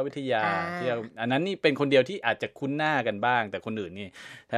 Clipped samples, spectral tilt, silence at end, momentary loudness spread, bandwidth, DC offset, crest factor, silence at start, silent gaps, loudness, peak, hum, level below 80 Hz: under 0.1%; -6 dB/octave; 0 s; 12 LU; 11.5 kHz; under 0.1%; 20 dB; 0 s; none; -27 LUFS; -8 dBFS; none; -72 dBFS